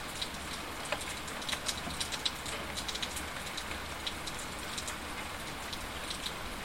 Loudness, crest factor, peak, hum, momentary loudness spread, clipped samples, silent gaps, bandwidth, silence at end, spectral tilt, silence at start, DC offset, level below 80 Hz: -37 LUFS; 26 dB; -12 dBFS; none; 5 LU; under 0.1%; none; 16.5 kHz; 0 s; -2 dB/octave; 0 s; 0.2%; -52 dBFS